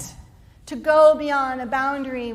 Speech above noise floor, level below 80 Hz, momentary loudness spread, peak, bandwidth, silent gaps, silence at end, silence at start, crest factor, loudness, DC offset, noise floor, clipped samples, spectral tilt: 27 dB; -52 dBFS; 16 LU; -4 dBFS; 13.5 kHz; none; 0 s; 0 s; 16 dB; -19 LUFS; under 0.1%; -46 dBFS; under 0.1%; -4.5 dB/octave